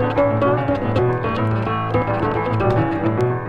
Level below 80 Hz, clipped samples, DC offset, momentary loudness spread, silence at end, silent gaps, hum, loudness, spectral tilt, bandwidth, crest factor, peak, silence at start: -38 dBFS; under 0.1%; under 0.1%; 3 LU; 0 s; none; none; -19 LUFS; -9 dB/octave; 6.2 kHz; 14 dB; -4 dBFS; 0 s